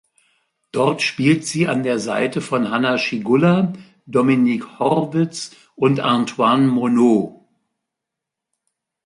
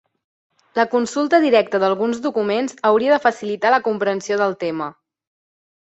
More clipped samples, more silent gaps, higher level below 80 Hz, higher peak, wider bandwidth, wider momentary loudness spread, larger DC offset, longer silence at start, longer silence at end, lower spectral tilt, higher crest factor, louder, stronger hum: neither; neither; about the same, -62 dBFS vs -66 dBFS; about the same, -2 dBFS vs -2 dBFS; first, 11.5 kHz vs 8.2 kHz; about the same, 7 LU vs 8 LU; neither; about the same, 0.75 s vs 0.75 s; first, 1.75 s vs 1.05 s; first, -6 dB/octave vs -4.5 dB/octave; about the same, 16 dB vs 18 dB; about the same, -18 LUFS vs -19 LUFS; neither